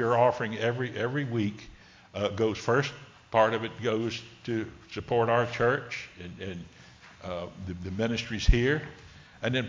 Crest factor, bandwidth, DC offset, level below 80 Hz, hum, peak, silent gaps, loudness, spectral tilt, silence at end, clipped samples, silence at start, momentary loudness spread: 22 dB; 7.6 kHz; under 0.1%; -40 dBFS; none; -6 dBFS; none; -29 LUFS; -6 dB/octave; 0 s; under 0.1%; 0 s; 17 LU